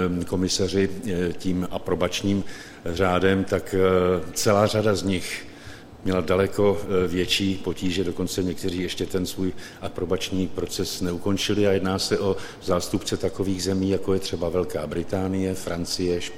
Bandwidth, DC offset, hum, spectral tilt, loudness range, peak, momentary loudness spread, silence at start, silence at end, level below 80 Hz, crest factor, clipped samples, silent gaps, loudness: 16.5 kHz; under 0.1%; none; -5 dB/octave; 4 LU; -4 dBFS; 8 LU; 0 s; 0 s; -46 dBFS; 20 dB; under 0.1%; none; -24 LUFS